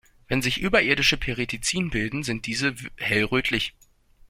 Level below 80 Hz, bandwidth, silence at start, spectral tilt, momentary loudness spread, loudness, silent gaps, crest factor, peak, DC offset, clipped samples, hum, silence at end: -42 dBFS; 16.5 kHz; 0.3 s; -3.5 dB/octave; 8 LU; -24 LUFS; none; 20 dB; -6 dBFS; under 0.1%; under 0.1%; none; 0.6 s